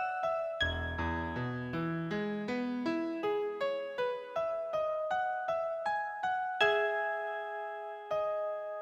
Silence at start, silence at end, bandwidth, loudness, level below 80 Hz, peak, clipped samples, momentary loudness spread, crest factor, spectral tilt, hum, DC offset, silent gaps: 0 s; 0 s; 8.6 kHz; -34 LUFS; -54 dBFS; -14 dBFS; under 0.1%; 6 LU; 20 dB; -6 dB/octave; none; under 0.1%; none